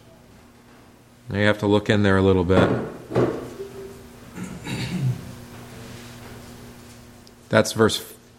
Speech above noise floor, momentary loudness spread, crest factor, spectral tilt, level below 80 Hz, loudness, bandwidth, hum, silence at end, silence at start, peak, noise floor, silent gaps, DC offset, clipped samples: 31 dB; 23 LU; 24 dB; -6 dB/octave; -50 dBFS; -21 LUFS; 16.5 kHz; none; 0.25 s; 1.25 s; 0 dBFS; -50 dBFS; none; under 0.1%; under 0.1%